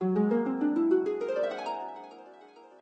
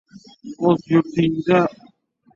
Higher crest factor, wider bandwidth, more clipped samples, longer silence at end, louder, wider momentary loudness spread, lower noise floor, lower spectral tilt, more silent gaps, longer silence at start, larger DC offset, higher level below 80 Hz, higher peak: about the same, 14 dB vs 18 dB; first, 8.2 kHz vs 7.2 kHz; neither; second, 0.15 s vs 0.65 s; second, -29 LUFS vs -19 LUFS; first, 19 LU vs 15 LU; about the same, -53 dBFS vs -55 dBFS; about the same, -8.5 dB/octave vs -8 dB/octave; neither; second, 0 s vs 0.45 s; neither; second, -78 dBFS vs -58 dBFS; second, -14 dBFS vs -2 dBFS